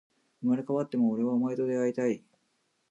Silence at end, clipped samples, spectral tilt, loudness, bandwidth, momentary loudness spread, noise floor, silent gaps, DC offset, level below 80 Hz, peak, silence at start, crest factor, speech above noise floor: 0.7 s; under 0.1%; -8 dB/octave; -29 LUFS; 8 kHz; 4 LU; -75 dBFS; none; under 0.1%; -84 dBFS; -16 dBFS; 0.4 s; 14 dB; 47 dB